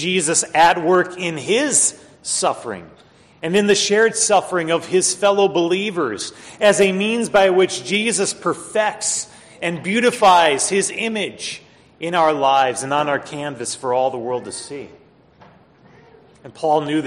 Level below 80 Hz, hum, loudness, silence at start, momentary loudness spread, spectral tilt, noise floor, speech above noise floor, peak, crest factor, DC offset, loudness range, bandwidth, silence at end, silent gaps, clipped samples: -60 dBFS; none; -17 LUFS; 0 s; 14 LU; -2.5 dB/octave; -49 dBFS; 31 dB; -2 dBFS; 16 dB; under 0.1%; 6 LU; 13 kHz; 0 s; none; under 0.1%